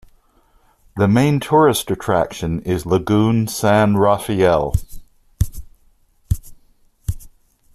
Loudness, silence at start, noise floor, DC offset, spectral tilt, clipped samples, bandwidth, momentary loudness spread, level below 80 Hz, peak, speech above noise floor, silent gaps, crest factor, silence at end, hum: -17 LUFS; 0.95 s; -56 dBFS; under 0.1%; -6 dB/octave; under 0.1%; 14.5 kHz; 14 LU; -34 dBFS; -2 dBFS; 40 dB; none; 16 dB; 0.45 s; none